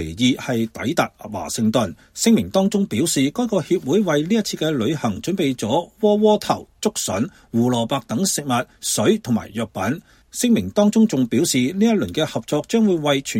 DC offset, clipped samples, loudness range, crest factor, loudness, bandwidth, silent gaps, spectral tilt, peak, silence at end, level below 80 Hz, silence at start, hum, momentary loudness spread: under 0.1%; under 0.1%; 2 LU; 16 dB; -20 LUFS; 16.5 kHz; none; -4.5 dB/octave; -2 dBFS; 0 s; -52 dBFS; 0 s; none; 7 LU